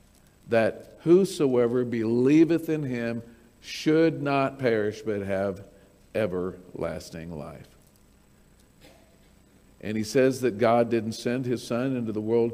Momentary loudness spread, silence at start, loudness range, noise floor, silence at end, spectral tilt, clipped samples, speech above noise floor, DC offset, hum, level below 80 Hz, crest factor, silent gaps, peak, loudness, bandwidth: 16 LU; 0.45 s; 12 LU; -58 dBFS; 0 s; -6.5 dB/octave; under 0.1%; 33 dB; under 0.1%; none; -60 dBFS; 18 dB; none; -8 dBFS; -25 LUFS; 16 kHz